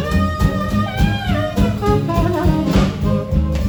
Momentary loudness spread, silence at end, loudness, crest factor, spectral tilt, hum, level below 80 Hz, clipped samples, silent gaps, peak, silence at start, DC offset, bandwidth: 3 LU; 0 s; -17 LUFS; 14 dB; -7 dB/octave; none; -22 dBFS; under 0.1%; none; -2 dBFS; 0 s; under 0.1%; over 20 kHz